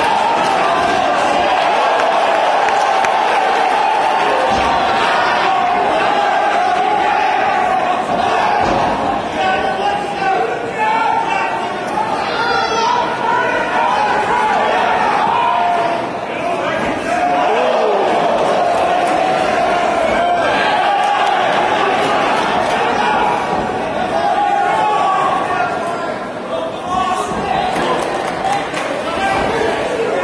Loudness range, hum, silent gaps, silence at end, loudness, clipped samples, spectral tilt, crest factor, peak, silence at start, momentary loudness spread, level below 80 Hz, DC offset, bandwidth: 3 LU; none; none; 0 s; -15 LUFS; under 0.1%; -4 dB/octave; 14 dB; -2 dBFS; 0 s; 5 LU; -44 dBFS; under 0.1%; 11 kHz